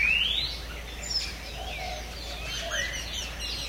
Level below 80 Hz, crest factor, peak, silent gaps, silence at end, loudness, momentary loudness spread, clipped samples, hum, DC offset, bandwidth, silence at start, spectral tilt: -40 dBFS; 16 dB; -14 dBFS; none; 0 s; -30 LUFS; 12 LU; under 0.1%; none; under 0.1%; 16 kHz; 0 s; -1.5 dB/octave